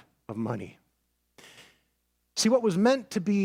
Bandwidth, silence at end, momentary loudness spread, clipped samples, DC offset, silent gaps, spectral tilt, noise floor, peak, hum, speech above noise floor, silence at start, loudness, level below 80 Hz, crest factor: 16 kHz; 0 s; 15 LU; under 0.1%; under 0.1%; none; -5 dB/octave; -75 dBFS; -10 dBFS; 60 Hz at -60 dBFS; 49 dB; 0.3 s; -27 LUFS; -72 dBFS; 18 dB